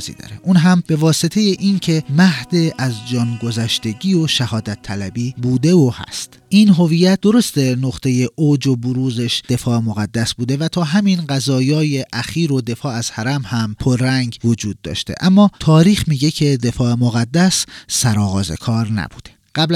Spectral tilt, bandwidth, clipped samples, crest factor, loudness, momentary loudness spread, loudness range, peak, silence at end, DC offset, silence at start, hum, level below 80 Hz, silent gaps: -5.5 dB/octave; 15 kHz; under 0.1%; 16 dB; -16 LUFS; 10 LU; 4 LU; 0 dBFS; 0 s; under 0.1%; 0 s; none; -44 dBFS; none